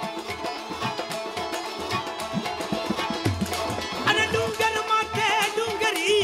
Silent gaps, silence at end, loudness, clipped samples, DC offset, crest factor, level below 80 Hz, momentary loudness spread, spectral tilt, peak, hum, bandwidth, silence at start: none; 0 s; -25 LUFS; under 0.1%; under 0.1%; 20 dB; -52 dBFS; 9 LU; -3.5 dB/octave; -6 dBFS; none; 16.5 kHz; 0 s